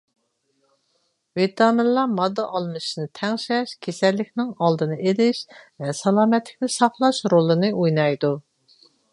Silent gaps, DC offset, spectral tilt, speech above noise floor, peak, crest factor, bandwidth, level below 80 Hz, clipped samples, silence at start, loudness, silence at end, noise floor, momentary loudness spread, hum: none; under 0.1%; -5.5 dB/octave; 49 dB; -2 dBFS; 20 dB; 11.5 kHz; -72 dBFS; under 0.1%; 1.35 s; -21 LUFS; 0.75 s; -70 dBFS; 10 LU; none